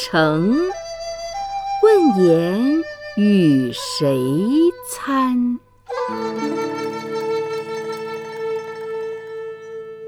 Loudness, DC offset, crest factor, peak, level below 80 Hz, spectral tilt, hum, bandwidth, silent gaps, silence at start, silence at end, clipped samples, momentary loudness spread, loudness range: -19 LUFS; under 0.1%; 16 dB; -2 dBFS; -54 dBFS; -6 dB/octave; none; 18.5 kHz; none; 0 s; 0 s; under 0.1%; 14 LU; 9 LU